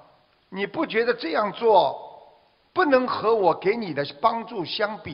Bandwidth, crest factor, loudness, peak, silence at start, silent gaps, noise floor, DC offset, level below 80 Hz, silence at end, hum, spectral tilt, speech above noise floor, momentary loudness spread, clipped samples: 5.6 kHz; 20 dB; -23 LUFS; -4 dBFS; 0.5 s; none; -59 dBFS; under 0.1%; -64 dBFS; 0 s; none; -8 dB/octave; 36 dB; 11 LU; under 0.1%